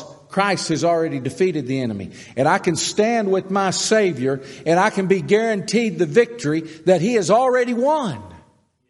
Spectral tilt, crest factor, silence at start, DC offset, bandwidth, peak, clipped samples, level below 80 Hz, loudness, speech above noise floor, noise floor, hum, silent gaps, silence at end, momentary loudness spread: -4.5 dB/octave; 18 dB; 0 s; under 0.1%; 11.5 kHz; -2 dBFS; under 0.1%; -62 dBFS; -19 LUFS; 37 dB; -56 dBFS; none; none; 0.5 s; 7 LU